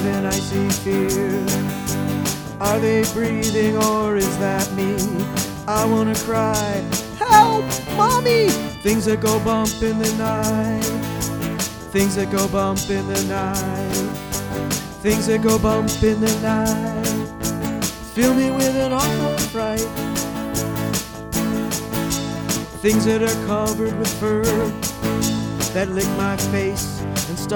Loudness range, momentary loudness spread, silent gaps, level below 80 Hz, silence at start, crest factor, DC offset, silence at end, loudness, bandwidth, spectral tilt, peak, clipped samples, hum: 4 LU; 7 LU; none; -38 dBFS; 0 s; 20 dB; under 0.1%; 0 s; -20 LUFS; over 20 kHz; -4.5 dB/octave; 0 dBFS; under 0.1%; none